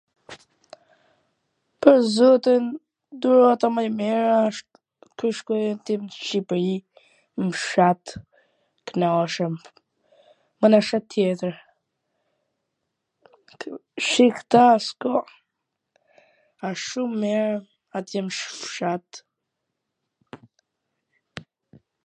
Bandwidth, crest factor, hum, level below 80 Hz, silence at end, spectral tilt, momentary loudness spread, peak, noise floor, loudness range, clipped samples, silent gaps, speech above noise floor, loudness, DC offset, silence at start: 9.8 kHz; 22 dB; none; -70 dBFS; 0.65 s; -5.5 dB/octave; 20 LU; 0 dBFS; -81 dBFS; 10 LU; under 0.1%; none; 60 dB; -22 LUFS; under 0.1%; 0.3 s